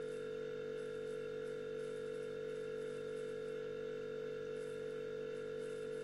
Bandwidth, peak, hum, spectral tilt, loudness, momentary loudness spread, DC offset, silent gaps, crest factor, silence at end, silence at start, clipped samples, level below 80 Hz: 12 kHz; -36 dBFS; none; -5.5 dB/octave; -45 LUFS; 0 LU; under 0.1%; none; 8 dB; 0 s; 0 s; under 0.1%; -76 dBFS